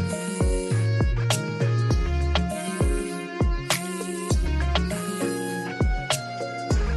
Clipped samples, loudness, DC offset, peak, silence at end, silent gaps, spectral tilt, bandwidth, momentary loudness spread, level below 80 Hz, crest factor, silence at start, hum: under 0.1%; -26 LUFS; under 0.1%; -8 dBFS; 0 s; none; -5 dB/octave; 12.5 kHz; 5 LU; -28 dBFS; 18 dB; 0 s; none